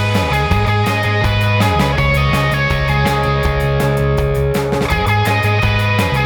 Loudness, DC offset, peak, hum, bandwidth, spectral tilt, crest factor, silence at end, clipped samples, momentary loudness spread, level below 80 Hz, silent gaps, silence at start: -15 LUFS; under 0.1%; -2 dBFS; none; 18 kHz; -6 dB/octave; 12 dB; 0 s; under 0.1%; 2 LU; -24 dBFS; none; 0 s